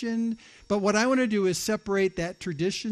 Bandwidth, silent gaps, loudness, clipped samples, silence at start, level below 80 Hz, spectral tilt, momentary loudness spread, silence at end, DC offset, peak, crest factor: 13.5 kHz; none; -26 LUFS; under 0.1%; 0 s; -56 dBFS; -4.5 dB/octave; 9 LU; 0 s; under 0.1%; -12 dBFS; 14 dB